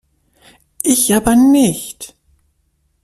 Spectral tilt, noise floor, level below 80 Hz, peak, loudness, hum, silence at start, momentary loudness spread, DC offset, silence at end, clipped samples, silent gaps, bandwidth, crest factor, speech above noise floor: -4 dB/octave; -63 dBFS; -42 dBFS; 0 dBFS; -13 LUFS; none; 0.85 s; 20 LU; under 0.1%; 0.95 s; under 0.1%; none; 15 kHz; 16 dB; 50 dB